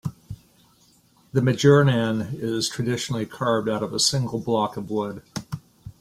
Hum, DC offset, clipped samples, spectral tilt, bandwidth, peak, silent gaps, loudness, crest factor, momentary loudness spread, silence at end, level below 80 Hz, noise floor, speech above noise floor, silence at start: none; under 0.1%; under 0.1%; -5 dB/octave; 15.5 kHz; -4 dBFS; none; -23 LUFS; 20 dB; 18 LU; 0.1 s; -56 dBFS; -58 dBFS; 36 dB; 0.05 s